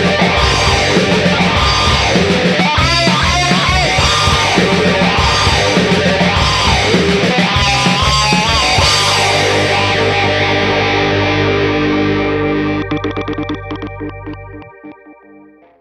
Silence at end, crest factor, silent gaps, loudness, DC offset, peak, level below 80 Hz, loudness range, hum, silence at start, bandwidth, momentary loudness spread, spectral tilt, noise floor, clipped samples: 0.7 s; 12 dB; none; -11 LUFS; under 0.1%; 0 dBFS; -26 dBFS; 6 LU; none; 0 s; 13.5 kHz; 8 LU; -4 dB/octave; -42 dBFS; under 0.1%